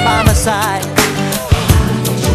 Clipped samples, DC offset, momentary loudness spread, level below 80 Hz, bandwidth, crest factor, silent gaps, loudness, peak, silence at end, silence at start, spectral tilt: 0.1%; under 0.1%; 4 LU; -20 dBFS; 14.5 kHz; 12 dB; none; -13 LUFS; 0 dBFS; 0 s; 0 s; -4.5 dB/octave